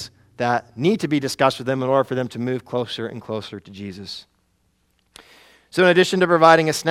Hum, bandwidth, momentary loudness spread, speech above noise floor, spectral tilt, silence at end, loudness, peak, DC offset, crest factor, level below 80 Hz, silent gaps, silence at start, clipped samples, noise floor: none; 15 kHz; 20 LU; 46 dB; -5 dB/octave; 0 s; -19 LUFS; 0 dBFS; under 0.1%; 20 dB; -62 dBFS; none; 0 s; under 0.1%; -65 dBFS